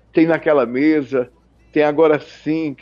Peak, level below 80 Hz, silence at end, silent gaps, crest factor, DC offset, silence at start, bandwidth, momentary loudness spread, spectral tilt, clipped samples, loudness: -4 dBFS; -58 dBFS; 0.05 s; none; 14 dB; under 0.1%; 0.15 s; 7 kHz; 9 LU; -8 dB/octave; under 0.1%; -17 LUFS